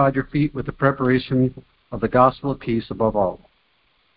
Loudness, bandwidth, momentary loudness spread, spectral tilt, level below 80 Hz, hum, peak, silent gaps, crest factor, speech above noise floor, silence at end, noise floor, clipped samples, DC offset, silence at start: -21 LUFS; 5 kHz; 10 LU; -12 dB/octave; -46 dBFS; none; -2 dBFS; none; 20 dB; 43 dB; 0.8 s; -63 dBFS; under 0.1%; under 0.1%; 0 s